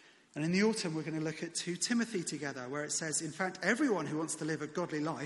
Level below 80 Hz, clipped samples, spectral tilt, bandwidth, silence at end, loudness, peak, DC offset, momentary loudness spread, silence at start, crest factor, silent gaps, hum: -78 dBFS; under 0.1%; -4 dB/octave; 11.5 kHz; 0 s; -35 LUFS; -16 dBFS; under 0.1%; 8 LU; 0.35 s; 20 dB; none; none